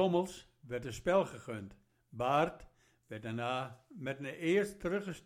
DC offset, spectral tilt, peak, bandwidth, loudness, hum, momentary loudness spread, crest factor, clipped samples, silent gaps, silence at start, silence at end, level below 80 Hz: under 0.1%; -6 dB/octave; -16 dBFS; 15.5 kHz; -36 LUFS; none; 16 LU; 20 dB; under 0.1%; none; 0 s; 0.05 s; -64 dBFS